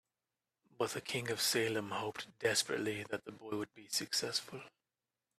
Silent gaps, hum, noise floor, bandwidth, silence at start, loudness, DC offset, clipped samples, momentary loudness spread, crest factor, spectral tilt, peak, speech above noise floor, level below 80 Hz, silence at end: none; none; under -90 dBFS; 15.5 kHz; 0.8 s; -37 LUFS; under 0.1%; under 0.1%; 11 LU; 22 dB; -2.5 dB/octave; -18 dBFS; over 52 dB; -78 dBFS; 0.7 s